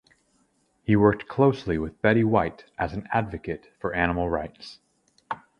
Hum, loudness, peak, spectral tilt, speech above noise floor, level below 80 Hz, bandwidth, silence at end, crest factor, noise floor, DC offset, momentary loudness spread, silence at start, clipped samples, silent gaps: none; -25 LUFS; -4 dBFS; -8.5 dB/octave; 43 dB; -46 dBFS; 9.6 kHz; 0.25 s; 22 dB; -67 dBFS; under 0.1%; 16 LU; 0.9 s; under 0.1%; none